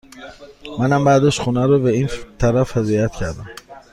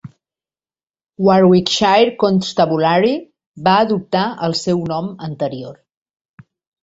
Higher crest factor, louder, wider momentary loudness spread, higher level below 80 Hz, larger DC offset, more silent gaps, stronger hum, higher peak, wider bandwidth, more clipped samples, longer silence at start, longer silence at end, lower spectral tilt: about the same, 16 dB vs 16 dB; about the same, -18 LUFS vs -16 LUFS; first, 23 LU vs 12 LU; first, -38 dBFS vs -56 dBFS; neither; second, none vs 3.46-3.54 s; neither; about the same, -2 dBFS vs 0 dBFS; first, 12 kHz vs 8 kHz; neither; about the same, 0.15 s vs 0.05 s; second, 0.15 s vs 1.1 s; about the same, -6.5 dB/octave vs -5.5 dB/octave